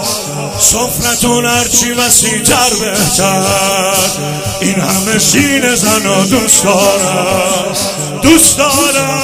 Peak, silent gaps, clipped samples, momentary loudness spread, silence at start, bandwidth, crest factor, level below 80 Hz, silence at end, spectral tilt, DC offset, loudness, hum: 0 dBFS; none; 0.5%; 7 LU; 0 s; over 20 kHz; 10 dB; -36 dBFS; 0 s; -2.5 dB/octave; under 0.1%; -9 LUFS; none